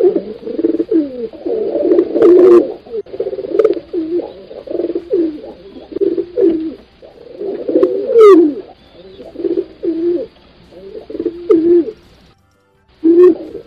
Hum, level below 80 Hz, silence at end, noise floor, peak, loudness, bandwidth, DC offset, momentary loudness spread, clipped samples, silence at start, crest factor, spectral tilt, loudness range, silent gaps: none; -52 dBFS; 0.05 s; -54 dBFS; 0 dBFS; -13 LUFS; 5.2 kHz; under 0.1%; 19 LU; under 0.1%; 0 s; 14 dB; -7.5 dB/octave; 6 LU; none